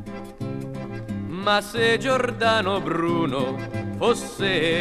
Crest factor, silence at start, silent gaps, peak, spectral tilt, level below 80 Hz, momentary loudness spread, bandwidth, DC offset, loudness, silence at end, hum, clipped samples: 16 dB; 0 s; none; -8 dBFS; -5 dB/octave; -48 dBFS; 12 LU; 14 kHz; under 0.1%; -23 LUFS; 0 s; none; under 0.1%